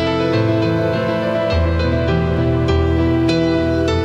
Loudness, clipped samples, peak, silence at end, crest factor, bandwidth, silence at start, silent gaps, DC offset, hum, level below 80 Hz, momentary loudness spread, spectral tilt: -17 LUFS; under 0.1%; -4 dBFS; 0 s; 12 dB; 8.6 kHz; 0 s; none; under 0.1%; none; -28 dBFS; 2 LU; -7.5 dB/octave